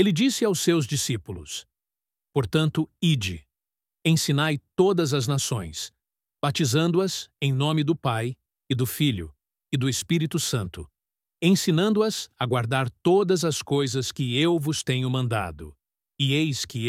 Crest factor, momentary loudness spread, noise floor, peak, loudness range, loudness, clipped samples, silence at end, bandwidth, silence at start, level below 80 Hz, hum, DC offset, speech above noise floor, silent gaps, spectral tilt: 18 dB; 12 LU; under -90 dBFS; -6 dBFS; 3 LU; -24 LUFS; under 0.1%; 0 s; 16 kHz; 0 s; -54 dBFS; none; under 0.1%; over 66 dB; none; -5 dB/octave